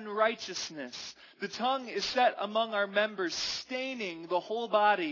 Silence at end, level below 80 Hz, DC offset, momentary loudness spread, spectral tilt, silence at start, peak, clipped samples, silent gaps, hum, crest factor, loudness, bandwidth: 0 s; -74 dBFS; under 0.1%; 12 LU; -2.5 dB/octave; 0 s; -14 dBFS; under 0.1%; none; none; 18 dB; -31 LUFS; 6 kHz